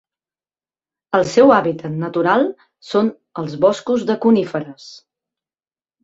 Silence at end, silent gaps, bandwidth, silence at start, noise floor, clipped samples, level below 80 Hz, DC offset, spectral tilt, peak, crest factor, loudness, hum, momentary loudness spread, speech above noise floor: 1.05 s; none; 8 kHz; 1.1 s; under -90 dBFS; under 0.1%; -60 dBFS; under 0.1%; -6.5 dB/octave; -2 dBFS; 16 dB; -17 LUFS; none; 15 LU; over 73 dB